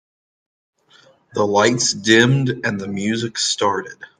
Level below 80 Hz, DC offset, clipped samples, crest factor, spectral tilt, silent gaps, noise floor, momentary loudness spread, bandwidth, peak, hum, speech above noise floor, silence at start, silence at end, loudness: -62 dBFS; under 0.1%; under 0.1%; 20 dB; -4 dB/octave; none; -53 dBFS; 10 LU; 10.5 kHz; 0 dBFS; none; 35 dB; 1.35 s; 0.15 s; -17 LUFS